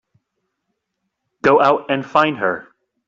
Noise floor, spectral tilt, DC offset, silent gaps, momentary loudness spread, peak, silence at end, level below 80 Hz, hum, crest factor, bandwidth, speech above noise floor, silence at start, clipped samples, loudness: -76 dBFS; -6 dB/octave; under 0.1%; none; 8 LU; -2 dBFS; 0.45 s; -62 dBFS; none; 18 dB; 7.6 kHz; 60 dB; 1.45 s; under 0.1%; -16 LUFS